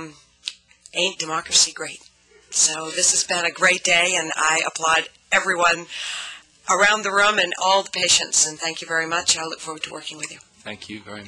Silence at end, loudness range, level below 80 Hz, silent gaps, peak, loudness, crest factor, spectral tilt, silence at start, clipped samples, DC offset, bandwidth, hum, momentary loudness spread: 0 s; 2 LU; -62 dBFS; none; -6 dBFS; -19 LUFS; 16 dB; 0 dB/octave; 0 s; under 0.1%; under 0.1%; 14 kHz; none; 17 LU